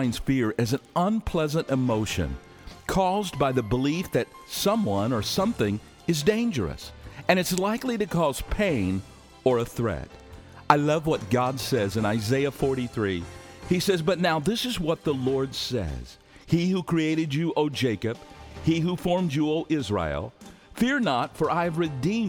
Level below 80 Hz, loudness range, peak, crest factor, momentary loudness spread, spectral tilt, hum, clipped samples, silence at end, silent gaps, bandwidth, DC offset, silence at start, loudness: -46 dBFS; 1 LU; 0 dBFS; 26 dB; 9 LU; -5.5 dB/octave; none; under 0.1%; 0 s; none; over 20 kHz; under 0.1%; 0 s; -26 LUFS